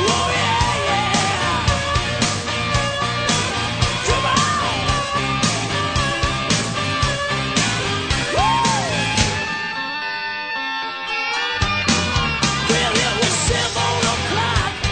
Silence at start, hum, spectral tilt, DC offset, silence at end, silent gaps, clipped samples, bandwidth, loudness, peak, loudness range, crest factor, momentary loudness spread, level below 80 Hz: 0 s; none; -3 dB/octave; under 0.1%; 0 s; none; under 0.1%; 9.4 kHz; -19 LUFS; -2 dBFS; 2 LU; 16 dB; 5 LU; -34 dBFS